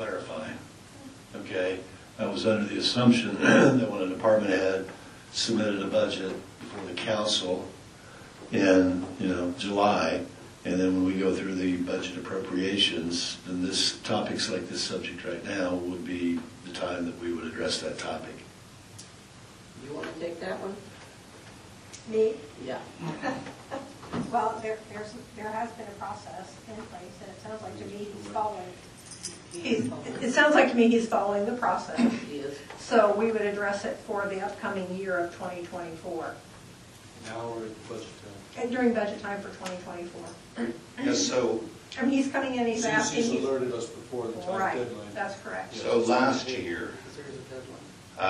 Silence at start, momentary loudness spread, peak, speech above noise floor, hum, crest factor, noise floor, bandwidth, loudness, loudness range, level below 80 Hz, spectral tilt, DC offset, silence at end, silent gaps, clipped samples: 0 s; 20 LU; -6 dBFS; 21 dB; none; 22 dB; -49 dBFS; 12.5 kHz; -28 LUFS; 12 LU; -62 dBFS; -4 dB/octave; under 0.1%; 0 s; none; under 0.1%